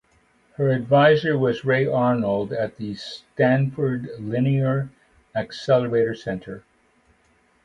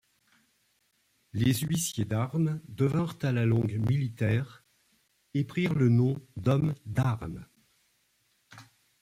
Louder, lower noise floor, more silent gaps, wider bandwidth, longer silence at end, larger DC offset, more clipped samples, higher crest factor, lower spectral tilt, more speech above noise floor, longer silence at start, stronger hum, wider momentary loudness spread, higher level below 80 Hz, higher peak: first, -22 LUFS vs -29 LUFS; second, -61 dBFS vs -72 dBFS; neither; second, 7.6 kHz vs 16 kHz; first, 1.05 s vs 0.4 s; neither; neither; about the same, 18 dB vs 18 dB; first, -8 dB/octave vs -6.5 dB/octave; second, 40 dB vs 44 dB; second, 0.6 s vs 1.35 s; neither; first, 15 LU vs 8 LU; about the same, -58 dBFS vs -60 dBFS; first, -4 dBFS vs -12 dBFS